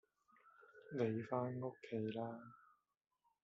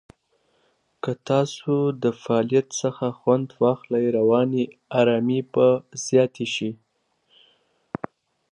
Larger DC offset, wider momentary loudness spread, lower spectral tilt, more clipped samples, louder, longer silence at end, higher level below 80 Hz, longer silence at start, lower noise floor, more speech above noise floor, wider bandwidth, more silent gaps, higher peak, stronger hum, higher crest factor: neither; first, 21 LU vs 12 LU; about the same, -7 dB/octave vs -6 dB/octave; neither; second, -44 LUFS vs -22 LUFS; second, 0.9 s vs 1.75 s; second, -86 dBFS vs -68 dBFS; second, 0.45 s vs 1.05 s; first, -72 dBFS vs -67 dBFS; second, 29 dB vs 45 dB; second, 7.4 kHz vs 11 kHz; neither; second, -26 dBFS vs -6 dBFS; neither; about the same, 20 dB vs 18 dB